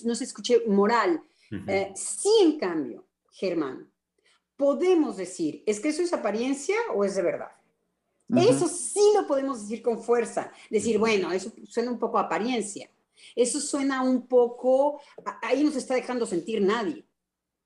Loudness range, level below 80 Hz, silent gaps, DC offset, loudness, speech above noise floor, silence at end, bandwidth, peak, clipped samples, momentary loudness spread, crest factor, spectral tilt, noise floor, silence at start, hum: 3 LU; -72 dBFS; none; under 0.1%; -26 LUFS; 59 dB; 0.65 s; 12 kHz; -10 dBFS; under 0.1%; 12 LU; 16 dB; -4.5 dB/octave; -84 dBFS; 0 s; none